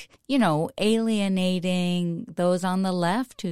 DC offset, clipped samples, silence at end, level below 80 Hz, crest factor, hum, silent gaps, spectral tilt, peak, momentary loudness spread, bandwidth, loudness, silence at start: 0.4%; under 0.1%; 0 s; -62 dBFS; 14 dB; none; none; -6 dB/octave; -10 dBFS; 5 LU; 15 kHz; -24 LUFS; 0 s